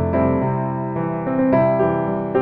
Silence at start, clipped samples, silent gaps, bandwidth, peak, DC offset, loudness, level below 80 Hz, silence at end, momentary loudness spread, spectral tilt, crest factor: 0 s; under 0.1%; none; 4.3 kHz; -4 dBFS; under 0.1%; -19 LUFS; -44 dBFS; 0 s; 7 LU; -12.5 dB/octave; 14 dB